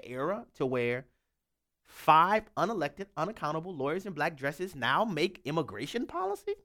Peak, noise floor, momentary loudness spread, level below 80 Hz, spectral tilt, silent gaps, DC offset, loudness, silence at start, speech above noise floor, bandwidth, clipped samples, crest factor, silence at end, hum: -8 dBFS; -84 dBFS; 11 LU; -66 dBFS; -5.5 dB/octave; none; under 0.1%; -31 LUFS; 0.05 s; 53 dB; 18 kHz; under 0.1%; 24 dB; 0.1 s; none